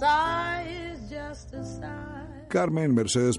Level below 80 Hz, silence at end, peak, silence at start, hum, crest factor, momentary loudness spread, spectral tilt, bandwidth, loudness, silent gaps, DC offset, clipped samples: -48 dBFS; 0 s; -12 dBFS; 0 s; none; 16 dB; 15 LU; -5 dB/octave; 11.5 kHz; -28 LUFS; none; under 0.1%; under 0.1%